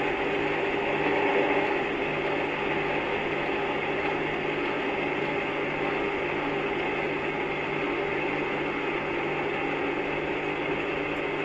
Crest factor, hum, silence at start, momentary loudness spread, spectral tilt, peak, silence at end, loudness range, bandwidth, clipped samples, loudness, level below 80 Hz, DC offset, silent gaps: 16 dB; none; 0 s; 4 LU; -6 dB/octave; -12 dBFS; 0 s; 2 LU; 8.2 kHz; under 0.1%; -28 LUFS; -54 dBFS; under 0.1%; none